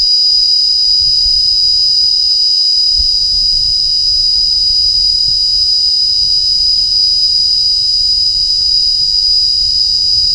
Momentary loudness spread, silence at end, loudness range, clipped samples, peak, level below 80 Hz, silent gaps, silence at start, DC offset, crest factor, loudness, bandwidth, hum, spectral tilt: 1 LU; 0 s; 1 LU; under 0.1%; -2 dBFS; -32 dBFS; none; 0 s; under 0.1%; 10 dB; -7 LUFS; over 20 kHz; none; 1 dB/octave